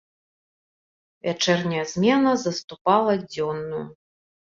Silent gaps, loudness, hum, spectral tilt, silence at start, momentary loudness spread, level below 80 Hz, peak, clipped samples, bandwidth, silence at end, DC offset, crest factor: 2.64-2.68 s, 2.81-2.85 s; -23 LUFS; none; -5 dB/octave; 1.25 s; 12 LU; -64 dBFS; -6 dBFS; under 0.1%; 7.6 kHz; 0.7 s; under 0.1%; 20 dB